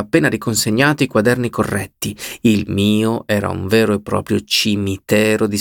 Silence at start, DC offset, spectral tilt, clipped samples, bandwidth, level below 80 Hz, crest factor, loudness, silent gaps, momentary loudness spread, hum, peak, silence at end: 0 s; under 0.1%; -4.5 dB/octave; under 0.1%; 19 kHz; -48 dBFS; 16 dB; -17 LUFS; none; 6 LU; none; -2 dBFS; 0 s